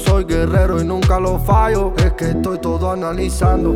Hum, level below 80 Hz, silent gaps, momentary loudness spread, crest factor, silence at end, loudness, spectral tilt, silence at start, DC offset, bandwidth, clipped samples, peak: none; -20 dBFS; none; 5 LU; 12 dB; 0 s; -17 LUFS; -7 dB/octave; 0 s; under 0.1%; 16 kHz; under 0.1%; -2 dBFS